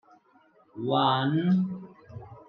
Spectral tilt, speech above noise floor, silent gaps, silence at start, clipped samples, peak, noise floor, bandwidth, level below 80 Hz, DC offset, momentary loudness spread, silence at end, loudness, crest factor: -9 dB/octave; 37 dB; none; 0.75 s; under 0.1%; -10 dBFS; -62 dBFS; 5.2 kHz; -70 dBFS; under 0.1%; 22 LU; 0.1 s; -26 LUFS; 18 dB